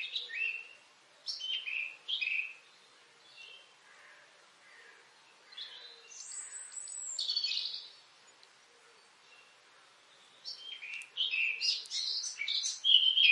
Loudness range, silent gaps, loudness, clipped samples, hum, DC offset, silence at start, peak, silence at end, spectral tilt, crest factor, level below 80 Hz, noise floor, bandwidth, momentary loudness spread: 16 LU; none; -32 LUFS; under 0.1%; none; under 0.1%; 0 s; -12 dBFS; 0 s; 5 dB/octave; 26 dB; under -90 dBFS; -62 dBFS; 11.5 kHz; 20 LU